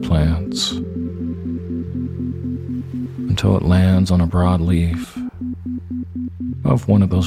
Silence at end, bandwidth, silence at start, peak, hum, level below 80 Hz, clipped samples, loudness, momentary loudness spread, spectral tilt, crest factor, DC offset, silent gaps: 0 s; 13 kHz; 0 s; -2 dBFS; none; -32 dBFS; under 0.1%; -20 LUFS; 12 LU; -7 dB/octave; 18 dB; under 0.1%; none